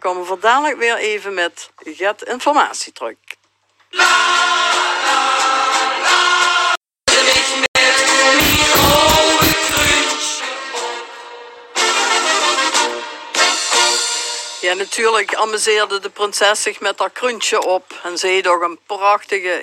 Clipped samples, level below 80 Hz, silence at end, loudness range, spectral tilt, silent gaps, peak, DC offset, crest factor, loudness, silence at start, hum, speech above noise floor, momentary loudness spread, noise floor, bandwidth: under 0.1%; -42 dBFS; 0 s; 6 LU; -1 dB/octave; 6.77-6.81 s, 7.68-7.74 s; 0 dBFS; under 0.1%; 16 dB; -14 LUFS; 0.05 s; none; 42 dB; 12 LU; -59 dBFS; 17 kHz